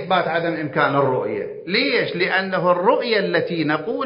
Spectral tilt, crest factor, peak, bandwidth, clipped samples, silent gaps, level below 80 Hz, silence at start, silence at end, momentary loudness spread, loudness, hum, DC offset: -10 dB/octave; 18 dB; -2 dBFS; 5.4 kHz; under 0.1%; none; -66 dBFS; 0 s; 0 s; 5 LU; -20 LUFS; none; under 0.1%